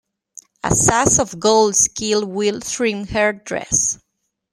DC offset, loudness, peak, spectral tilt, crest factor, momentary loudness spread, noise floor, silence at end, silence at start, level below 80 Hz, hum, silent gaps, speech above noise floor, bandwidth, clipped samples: under 0.1%; -17 LUFS; -2 dBFS; -3 dB/octave; 18 dB; 7 LU; -45 dBFS; 0.6 s; 0.65 s; -42 dBFS; none; none; 28 dB; 15.5 kHz; under 0.1%